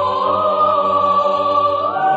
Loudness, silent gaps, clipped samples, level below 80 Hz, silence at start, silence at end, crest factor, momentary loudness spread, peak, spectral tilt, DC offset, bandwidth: -15 LUFS; none; under 0.1%; -58 dBFS; 0 s; 0 s; 12 dB; 2 LU; -4 dBFS; -6 dB/octave; under 0.1%; 7.8 kHz